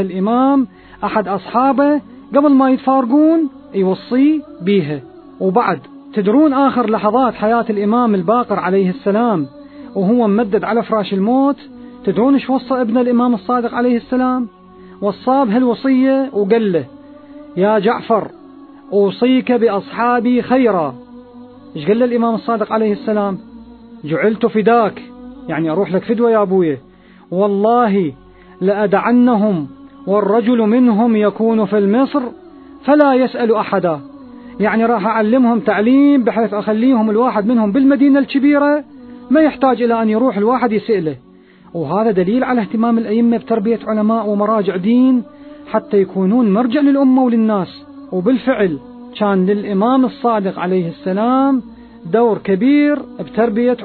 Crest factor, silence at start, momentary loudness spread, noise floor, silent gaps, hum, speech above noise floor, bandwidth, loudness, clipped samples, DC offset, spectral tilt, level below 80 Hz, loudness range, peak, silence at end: 14 dB; 0 s; 9 LU; -38 dBFS; none; none; 25 dB; 4.5 kHz; -15 LUFS; under 0.1%; under 0.1%; -11 dB/octave; -54 dBFS; 3 LU; 0 dBFS; 0 s